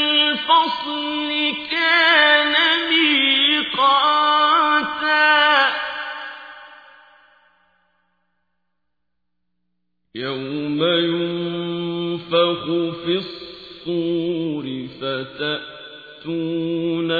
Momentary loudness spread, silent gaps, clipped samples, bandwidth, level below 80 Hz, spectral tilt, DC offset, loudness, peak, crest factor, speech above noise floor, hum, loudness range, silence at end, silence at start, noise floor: 16 LU; none; under 0.1%; 5 kHz; -62 dBFS; -6 dB/octave; under 0.1%; -18 LUFS; -2 dBFS; 18 dB; 57 dB; 60 Hz at -65 dBFS; 11 LU; 0 s; 0 s; -79 dBFS